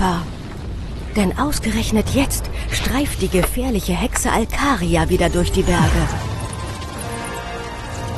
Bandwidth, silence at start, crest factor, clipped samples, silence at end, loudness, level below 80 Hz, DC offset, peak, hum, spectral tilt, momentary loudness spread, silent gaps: 13 kHz; 0 s; 16 dB; under 0.1%; 0 s; -20 LUFS; -26 dBFS; under 0.1%; -4 dBFS; none; -5 dB/octave; 11 LU; none